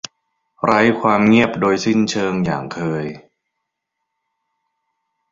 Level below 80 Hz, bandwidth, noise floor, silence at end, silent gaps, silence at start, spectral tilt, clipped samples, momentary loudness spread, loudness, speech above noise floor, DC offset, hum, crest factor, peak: -54 dBFS; 7.8 kHz; -78 dBFS; 2.15 s; none; 0.65 s; -5.5 dB/octave; under 0.1%; 11 LU; -17 LUFS; 61 dB; under 0.1%; none; 18 dB; 0 dBFS